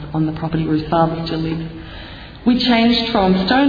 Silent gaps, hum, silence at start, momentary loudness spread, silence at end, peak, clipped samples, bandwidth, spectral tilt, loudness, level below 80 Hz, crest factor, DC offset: none; none; 0 s; 19 LU; 0 s; -2 dBFS; under 0.1%; 5 kHz; -7.5 dB/octave; -17 LUFS; -38 dBFS; 14 dB; under 0.1%